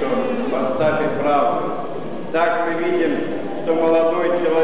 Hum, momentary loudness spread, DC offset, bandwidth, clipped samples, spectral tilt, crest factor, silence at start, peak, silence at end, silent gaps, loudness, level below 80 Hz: none; 9 LU; 4%; 4 kHz; under 0.1%; -10 dB/octave; 12 dB; 0 s; -8 dBFS; 0 s; none; -20 LUFS; -60 dBFS